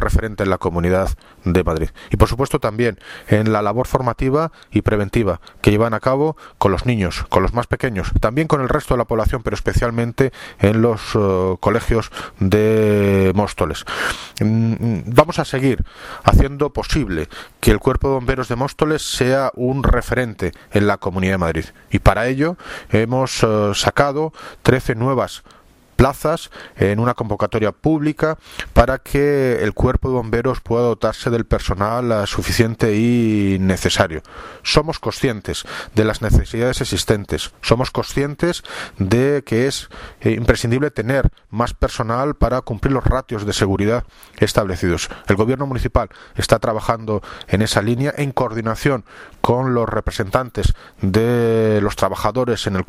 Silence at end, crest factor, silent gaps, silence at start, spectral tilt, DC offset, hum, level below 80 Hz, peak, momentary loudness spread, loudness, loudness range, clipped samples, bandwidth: 0.05 s; 18 dB; none; 0 s; -6 dB/octave; under 0.1%; none; -28 dBFS; 0 dBFS; 7 LU; -18 LUFS; 2 LU; under 0.1%; 16 kHz